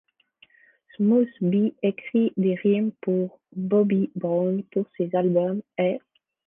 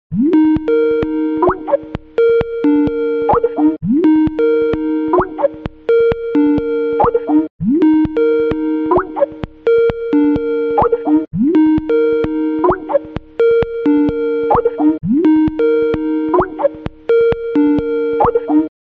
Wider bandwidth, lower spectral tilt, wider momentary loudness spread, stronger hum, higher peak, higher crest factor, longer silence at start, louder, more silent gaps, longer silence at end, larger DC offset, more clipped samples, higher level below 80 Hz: second, 3.7 kHz vs 4.4 kHz; first, -11.5 dB/octave vs -10 dB/octave; about the same, 6 LU vs 5 LU; neither; second, -10 dBFS vs -2 dBFS; about the same, 14 dB vs 12 dB; first, 1 s vs 0.1 s; second, -24 LUFS vs -14 LUFS; second, none vs 7.50-7.59 s; first, 0.5 s vs 0.15 s; neither; neither; second, -74 dBFS vs -38 dBFS